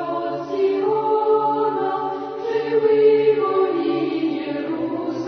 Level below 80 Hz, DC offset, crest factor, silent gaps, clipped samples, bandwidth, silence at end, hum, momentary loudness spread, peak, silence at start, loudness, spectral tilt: -66 dBFS; under 0.1%; 14 dB; none; under 0.1%; 6.2 kHz; 0 s; none; 10 LU; -6 dBFS; 0 s; -20 LUFS; -7.5 dB/octave